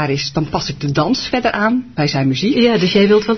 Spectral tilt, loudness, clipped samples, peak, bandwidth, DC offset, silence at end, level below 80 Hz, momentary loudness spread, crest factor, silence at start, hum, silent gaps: -5.5 dB/octave; -15 LUFS; under 0.1%; -2 dBFS; 6.4 kHz; 0.3%; 0 s; -42 dBFS; 7 LU; 14 dB; 0 s; none; none